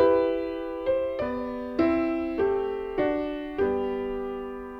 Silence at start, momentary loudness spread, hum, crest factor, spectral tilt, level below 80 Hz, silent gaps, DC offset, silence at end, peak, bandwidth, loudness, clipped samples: 0 s; 8 LU; none; 18 dB; -8 dB/octave; -50 dBFS; none; under 0.1%; 0 s; -10 dBFS; 5.8 kHz; -28 LUFS; under 0.1%